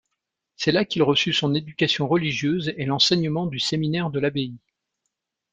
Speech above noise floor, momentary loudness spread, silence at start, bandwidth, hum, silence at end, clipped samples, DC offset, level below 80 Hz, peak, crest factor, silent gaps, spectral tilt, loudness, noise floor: 58 dB; 7 LU; 0.6 s; 9.2 kHz; none; 0.95 s; under 0.1%; under 0.1%; -58 dBFS; -6 dBFS; 18 dB; none; -5 dB/octave; -22 LUFS; -81 dBFS